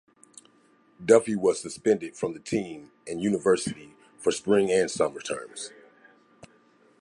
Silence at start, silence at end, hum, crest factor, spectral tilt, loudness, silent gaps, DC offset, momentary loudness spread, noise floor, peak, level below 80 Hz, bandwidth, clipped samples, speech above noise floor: 1 s; 1.35 s; none; 22 dB; -4.5 dB/octave; -26 LUFS; none; under 0.1%; 17 LU; -61 dBFS; -4 dBFS; -66 dBFS; 11.5 kHz; under 0.1%; 36 dB